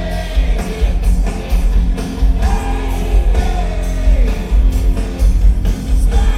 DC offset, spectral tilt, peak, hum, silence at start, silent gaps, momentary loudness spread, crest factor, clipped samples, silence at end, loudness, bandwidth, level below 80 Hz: under 0.1%; -6.5 dB/octave; -2 dBFS; none; 0 s; none; 4 LU; 12 dB; under 0.1%; 0 s; -17 LUFS; 13 kHz; -12 dBFS